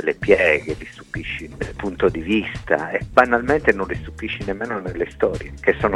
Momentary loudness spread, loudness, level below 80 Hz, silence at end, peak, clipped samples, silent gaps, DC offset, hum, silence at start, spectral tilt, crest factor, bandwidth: 13 LU; -21 LUFS; -38 dBFS; 0 s; 0 dBFS; under 0.1%; none; under 0.1%; none; 0 s; -6.5 dB/octave; 20 dB; 11.5 kHz